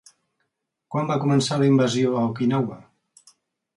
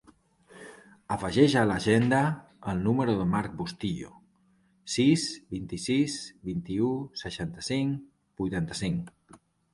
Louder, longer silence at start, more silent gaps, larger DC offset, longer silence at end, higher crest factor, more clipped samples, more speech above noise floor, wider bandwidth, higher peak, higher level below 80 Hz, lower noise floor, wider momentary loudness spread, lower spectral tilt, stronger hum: first, -22 LUFS vs -28 LUFS; first, 0.9 s vs 0.55 s; neither; neither; first, 0.95 s vs 0.4 s; second, 14 dB vs 22 dB; neither; first, 56 dB vs 38 dB; about the same, 11.5 kHz vs 11.5 kHz; about the same, -8 dBFS vs -8 dBFS; second, -66 dBFS vs -54 dBFS; first, -77 dBFS vs -66 dBFS; second, 9 LU vs 15 LU; about the same, -6.5 dB/octave vs -5.5 dB/octave; neither